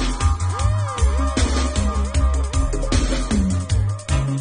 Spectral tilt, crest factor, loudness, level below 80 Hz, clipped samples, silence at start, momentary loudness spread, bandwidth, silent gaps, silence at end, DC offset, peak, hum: -5.5 dB/octave; 12 dB; -21 LUFS; -22 dBFS; under 0.1%; 0 s; 2 LU; 10 kHz; none; 0 s; under 0.1%; -6 dBFS; none